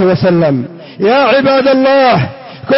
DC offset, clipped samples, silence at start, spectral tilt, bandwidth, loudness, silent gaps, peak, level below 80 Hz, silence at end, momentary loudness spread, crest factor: under 0.1%; under 0.1%; 0 s; -10 dB/octave; 5.8 kHz; -10 LUFS; none; -2 dBFS; -48 dBFS; 0 s; 12 LU; 8 dB